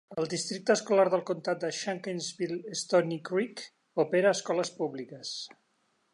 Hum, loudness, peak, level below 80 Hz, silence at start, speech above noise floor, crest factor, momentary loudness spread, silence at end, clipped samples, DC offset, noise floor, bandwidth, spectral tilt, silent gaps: none; -30 LUFS; -12 dBFS; -82 dBFS; 0.1 s; 44 dB; 18 dB; 12 LU; 0.65 s; under 0.1%; under 0.1%; -73 dBFS; 11.5 kHz; -4 dB/octave; none